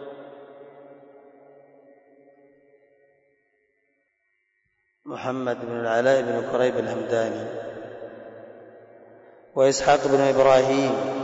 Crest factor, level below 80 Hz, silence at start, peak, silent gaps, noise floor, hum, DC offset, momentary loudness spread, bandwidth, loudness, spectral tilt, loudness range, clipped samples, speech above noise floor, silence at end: 18 dB; -62 dBFS; 0 s; -8 dBFS; none; -72 dBFS; none; under 0.1%; 25 LU; 8 kHz; -22 LUFS; -4.5 dB/octave; 13 LU; under 0.1%; 51 dB; 0 s